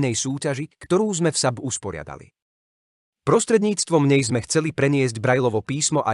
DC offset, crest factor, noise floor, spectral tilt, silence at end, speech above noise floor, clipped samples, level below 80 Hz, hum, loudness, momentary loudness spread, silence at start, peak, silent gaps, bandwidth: under 0.1%; 18 dB; under -90 dBFS; -4.5 dB/octave; 0 s; over 69 dB; under 0.1%; -58 dBFS; none; -21 LUFS; 10 LU; 0 s; -4 dBFS; 2.42-3.13 s; 11.5 kHz